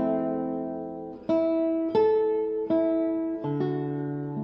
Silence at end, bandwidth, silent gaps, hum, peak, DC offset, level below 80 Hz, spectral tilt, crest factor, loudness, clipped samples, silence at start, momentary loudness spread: 0 s; 5.6 kHz; none; none; -14 dBFS; under 0.1%; -62 dBFS; -10.5 dB/octave; 12 dB; -27 LUFS; under 0.1%; 0 s; 9 LU